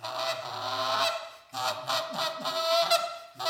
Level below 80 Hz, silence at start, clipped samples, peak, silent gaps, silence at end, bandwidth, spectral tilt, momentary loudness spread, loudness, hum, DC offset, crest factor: -82 dBFS; 0 s; under 0.1%; -12 dBFS; none; 0 s; 19 kHz; -1 dB/octave; 9 LU; -29 LUFS; none; under 0.1%; 20 dB